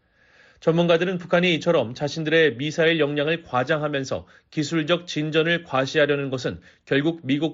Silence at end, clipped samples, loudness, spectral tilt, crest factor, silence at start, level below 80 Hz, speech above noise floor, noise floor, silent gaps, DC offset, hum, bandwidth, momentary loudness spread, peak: 0 s; under 0.1%; -22 LUFS; -4 dB/octave; 16 dB; 0.65 s; -60 dBFS; 34 dB; -56 dBFS; none; under 0.1%; none; 7.8 kHz; 9 LU; -6 dBFS